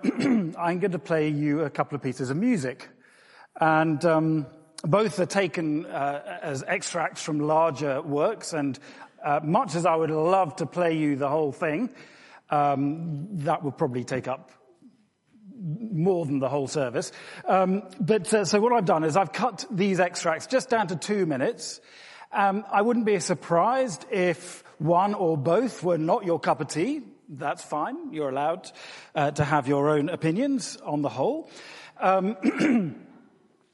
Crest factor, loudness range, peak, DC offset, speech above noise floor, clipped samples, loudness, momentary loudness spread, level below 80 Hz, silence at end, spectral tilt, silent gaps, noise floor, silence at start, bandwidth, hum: 18 dB; 5 LU; -8 dBFS; under 0.1%; 36 dB; under 0.1%; -26 LUFS; 11 LU; -70 dBFS; 0.65 s; -6 dB/octave; none; -61 dBFS; 0 s; 11.5 kHz; none